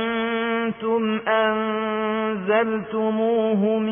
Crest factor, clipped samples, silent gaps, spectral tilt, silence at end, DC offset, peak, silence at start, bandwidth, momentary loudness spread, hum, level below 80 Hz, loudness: 14 dB; under 0.1%; none; -10.5 dB/octave; 0 s; under 0.1%; -8 dBFS; 0 s; 3.6 kHz; 4 LU; none; -62 dBFS; -22 LUFS